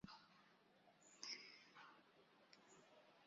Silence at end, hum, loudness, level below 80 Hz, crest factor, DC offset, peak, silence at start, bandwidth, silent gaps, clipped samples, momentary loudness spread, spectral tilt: 0 s; none; -58 LUFS; -90 dBFS; 30 dB; under 0.1%; -34 dBFS; 0 s; 7.6 kHz; none; under 0.1%; 16 LU; -1 dB/octave